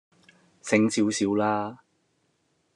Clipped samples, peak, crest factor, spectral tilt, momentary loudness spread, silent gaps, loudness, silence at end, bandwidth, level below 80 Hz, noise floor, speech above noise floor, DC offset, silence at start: under 0.1%; -6 dBFS; 22 dB; -4.5 dB/octave; 12 LU; none; -25 LUFS; 1 s; 11 kHz; -76 dBFS; -71 dBFS; 47 dB; under 0.1%; 0.65 s